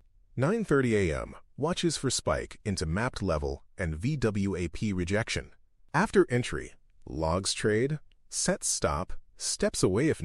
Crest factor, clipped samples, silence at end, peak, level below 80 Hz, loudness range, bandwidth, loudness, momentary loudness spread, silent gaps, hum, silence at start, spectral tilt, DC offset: 20 dB; under 0.1%; 0 s; -10 dBFS; -46 dBFS; 2 LU; 14 kHz; -29 LUFS; 10 LU; none; none; 0.35 s; -4.5 dB/octave; under 0.1%